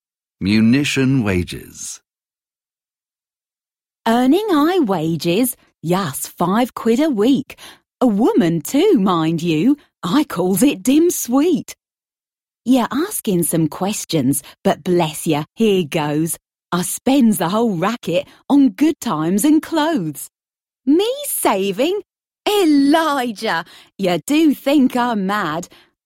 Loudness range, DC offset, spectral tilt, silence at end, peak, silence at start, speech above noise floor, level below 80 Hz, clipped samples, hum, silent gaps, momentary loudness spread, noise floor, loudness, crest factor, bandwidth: 3 LU; under 0.1%; -5 dB/octave; 0.4 s; -2 dBFS; 0.4 s; over 73 dB; -54 dBFS; under 0.1%; none; none; 10 LU; under -90 dBFS; -17 LUFS; 16 dB; 16.5 kHz